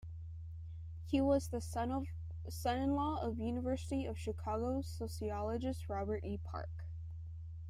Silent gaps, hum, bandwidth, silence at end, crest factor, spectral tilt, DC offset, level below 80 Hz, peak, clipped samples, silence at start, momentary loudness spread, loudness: none; none; 14.5 kHz; 0 s; 18 dB; -7 dB/octave; under 0.1%; -52 dBFS; -22 dBFS; under 0.1%; 0 s; 13 LU; -40 LUFS